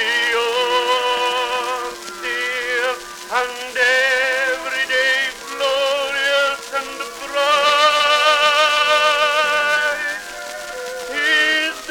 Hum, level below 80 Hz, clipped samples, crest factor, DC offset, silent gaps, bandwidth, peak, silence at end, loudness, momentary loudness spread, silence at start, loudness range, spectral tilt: none; -56 dBFS; under 0.1%; 18 dB; under 0.1%; none; 18 kHz; 0 dBFS; 0 s; -17 LUFS; 13 LU; 0 s; 5 LU; 0.5 dB/octave